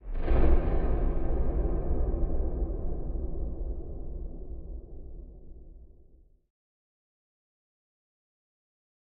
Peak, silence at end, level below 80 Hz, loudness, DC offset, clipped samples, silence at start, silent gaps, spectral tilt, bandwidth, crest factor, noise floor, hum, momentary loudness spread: -12 dBFS; 3.3 s; -30 dBFS; -33 LUFS; under 0.1%; under 0.1%; 0.05 s; none; -9.5 dB/octave; 3.2 kHz; 18 dB; -57 dBFS; none; 20 LU